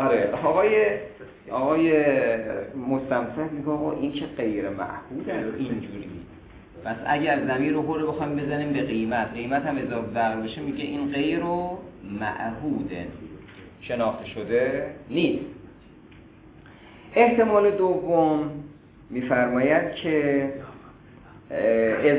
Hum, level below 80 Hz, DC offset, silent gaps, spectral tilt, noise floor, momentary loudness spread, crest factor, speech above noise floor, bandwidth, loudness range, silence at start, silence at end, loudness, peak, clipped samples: none; -54 dBFS; under 0.1%; none; -10.5 dB/octave; -49 dBFS; 17 LU; 20 dB; 24 dB; 4 kHz; 7 LU; 0 s; 0 s; -25 LUFS; -4 dBFS; under 0.1%